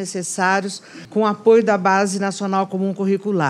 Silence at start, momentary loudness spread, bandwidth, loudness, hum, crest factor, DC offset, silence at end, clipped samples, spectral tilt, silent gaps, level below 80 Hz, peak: 0 s; 10 LU; 13 kHz; -18 LUFS; none; 16 dB; under 0.1%; 0 s; under 0.1%; -5 dB/octave; none; -72 dBFS; -2 dBFS